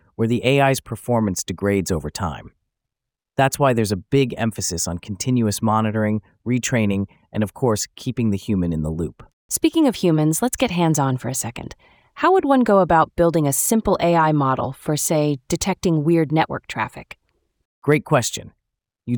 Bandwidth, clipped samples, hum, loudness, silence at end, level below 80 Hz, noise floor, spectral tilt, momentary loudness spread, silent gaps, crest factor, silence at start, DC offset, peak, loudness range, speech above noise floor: over 20 kHz; under 0.1%; none; -20 LUFS; 0 s; -46 dBFS; -85 dBFS; -5 dB/octave; 10 LU; 9.33-9.49 s, 17.65-17.82 s; 18 dB; 0.2 s; under 0.1%; -2 dBFS; 5 LU; 66 dB